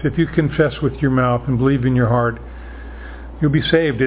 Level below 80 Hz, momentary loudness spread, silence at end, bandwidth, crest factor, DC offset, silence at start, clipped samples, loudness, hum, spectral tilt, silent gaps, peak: -34 dBFS; 19 LU; 0 s; 4 kHz; 18 dB; under 0.1%; 0 s; under 0.1%; -17 LUFS; none; -11.5 dB/octave; none; 0 dBFS